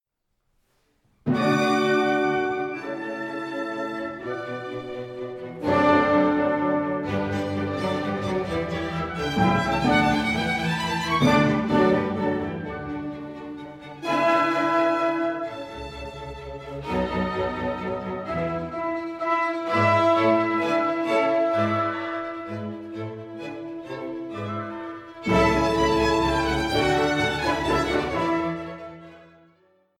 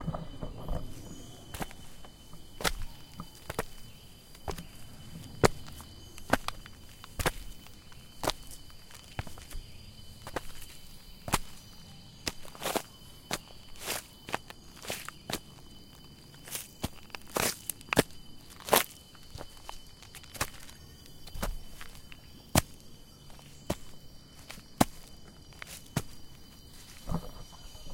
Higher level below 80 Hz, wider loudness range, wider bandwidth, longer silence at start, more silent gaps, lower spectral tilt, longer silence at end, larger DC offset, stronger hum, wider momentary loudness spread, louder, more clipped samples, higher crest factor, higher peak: about the same, -46 dBFS vs -46 dBFS; about the same, 7 LU vs 8 LU; about the same, 16 kHz vs 17 kHz; first, 1.25 s vs 0 s; neither; first, -6 dB/octave vs -3.5 dB/octave; first, 0.75 s vs 0 s; neither; neither; second, 15 LU vs 22 LU; first, -24 LUFS vs -35 LUFS; neither; second, 18 dB vs 36 dB; second, -6 dBFS vs -2 dBFS